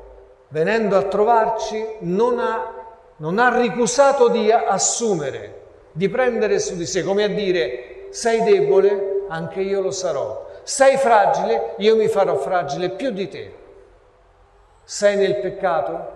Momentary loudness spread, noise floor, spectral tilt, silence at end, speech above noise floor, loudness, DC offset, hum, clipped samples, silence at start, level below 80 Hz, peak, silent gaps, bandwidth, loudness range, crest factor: 14 LU; -53 dBFS; -4 dB/octave; 0 s; 34 dB; -19 LUFS; under 0.1%; none; under 0.1%; 0 s; -54 dBFS; 0 dBFS; none; 12 kHz; 4 LU; 18 dB